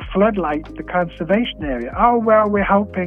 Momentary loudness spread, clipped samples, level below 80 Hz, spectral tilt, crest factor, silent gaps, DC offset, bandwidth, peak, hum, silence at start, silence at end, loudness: 9 LU; under 0.1%; -36 dBFS; -9 dB/octave; 16 dB; none; under 0.1%; 3.9 kHz; -2 dBFS; none; 0 s; 0 s; -18 LUFS